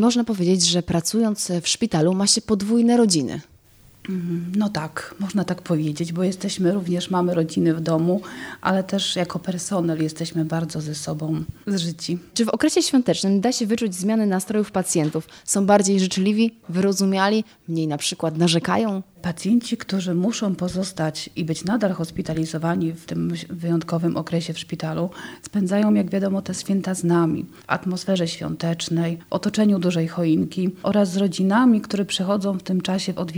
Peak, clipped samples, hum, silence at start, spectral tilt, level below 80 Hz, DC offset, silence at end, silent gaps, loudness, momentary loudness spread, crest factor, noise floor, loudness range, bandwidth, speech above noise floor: -2 dBFS; under 0.1%; none; 0 s; -5 dB/octave; -56 dBFS; under 0.1%; 0 s; none; -22 LUFS; 9 LU; 20 dB; -52 dBFS; 4 LU; over 20 kHz; 30 dB